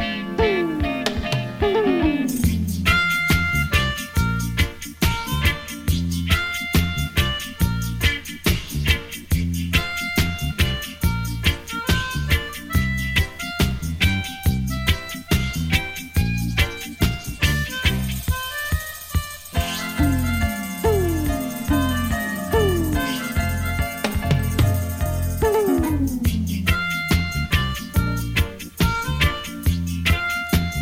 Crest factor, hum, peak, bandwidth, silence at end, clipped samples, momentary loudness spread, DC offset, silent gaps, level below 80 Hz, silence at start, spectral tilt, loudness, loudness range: 18 dB; none; -2 dBFS; 16.5 kHz; 0 s; under 0.1%; 5 LU; under 0.1%; none; -28 dBFS; 0 s; -5 dB/octave; -22 LUFS; 3 LU